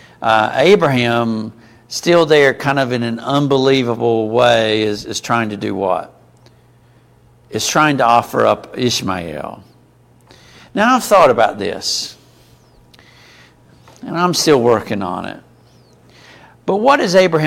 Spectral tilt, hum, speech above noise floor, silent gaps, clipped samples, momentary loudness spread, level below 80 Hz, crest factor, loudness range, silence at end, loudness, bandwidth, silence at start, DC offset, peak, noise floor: -4.5 dB/octave; none; 35 dB; none; under 0.1%; 14 LU; -52 dBFS; 16 dB; 5 LU; 0 s; -14 LUFS; 16.5 kHz; 0.2 s; under 0.1%; 0 dBFS; -49 dBFS